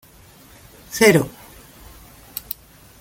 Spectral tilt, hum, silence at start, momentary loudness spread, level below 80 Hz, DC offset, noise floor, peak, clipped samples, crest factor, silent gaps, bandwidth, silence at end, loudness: -4.5 dB/octave; none; 0.9 s; 19 LU; -50 dBFS; under 0.1%; -47 dBFS; 0 dBFS; under 0.1%; 22 dB; none; 17 kHz; 0.6 s; -18 LUFS